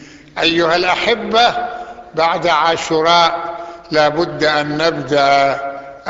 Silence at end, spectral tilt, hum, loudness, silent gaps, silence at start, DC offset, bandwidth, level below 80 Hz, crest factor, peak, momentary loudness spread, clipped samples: 0 s; -4 dB/octave; none; -14 LUFS; none; 0 s; under 0.1%; 8 kHz; -50 dBFS; 14 dB; -2 dBFS; 13 LU; under 0.1%